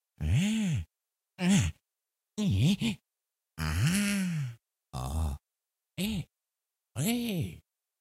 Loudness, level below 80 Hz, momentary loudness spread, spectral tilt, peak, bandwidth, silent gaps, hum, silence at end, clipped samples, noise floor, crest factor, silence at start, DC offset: -31 LUFS; -46 dBFS; 17 LU; -5 dB/octave; -14 dBFS; 16 kHz; none; none; 0.4 s; under 0.1%; -90 dBFS; 18 dB; 0.2 s; under 0.1%